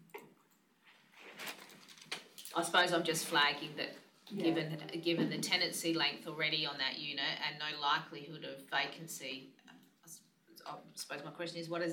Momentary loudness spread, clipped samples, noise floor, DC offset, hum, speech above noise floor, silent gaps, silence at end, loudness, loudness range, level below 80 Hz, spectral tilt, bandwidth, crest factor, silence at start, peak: 23 LU; under 0.1%; -71 dBFS; under 0.1%; none; 34 dB; none; 0 s; -36 LUFS; 9 LU; under -90 dBFS; -3 dB/octave; 19 kHz; 22 dB; 0 s; -18 dBFS